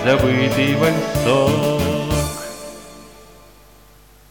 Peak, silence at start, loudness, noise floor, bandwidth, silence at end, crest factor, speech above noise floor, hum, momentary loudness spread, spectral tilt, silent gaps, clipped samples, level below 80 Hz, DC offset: -4 dBFS; 0 s; -18 LUFS; -48 dBFS; 19 kHz; 1.2 s; 16 dB; 31 dB; 50 Hz at -40 dBFS; 18 LU; -5.5 dB/octave; none; under 0.1%; -36 dBFS; 0.3%